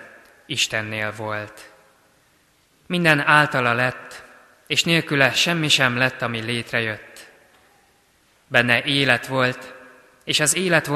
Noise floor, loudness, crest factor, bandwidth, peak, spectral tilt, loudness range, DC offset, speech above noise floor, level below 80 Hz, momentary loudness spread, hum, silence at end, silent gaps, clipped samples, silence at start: -60 dBFS; -19 LUFS; 22 dB; 13 kHz; 0 dBFS; -3 dB/octave; 4 LU; under 0.1%; 39 dB; -60 dBFS; 16 LU; none; 0 s; none; under 0.1%; 0 s